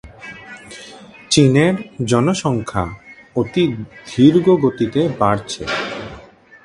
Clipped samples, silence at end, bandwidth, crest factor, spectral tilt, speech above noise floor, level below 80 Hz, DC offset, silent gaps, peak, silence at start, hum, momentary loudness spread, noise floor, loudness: under 0.1%; 0.45 s; 11.5 kHz; 18 dB; -5.5 dB/octave; 26 dB; -46 dBFS; under 0.1%; none; 0 dBFS; 0.05 s; none; 22 LU; -42 dBFS; -17 LUFS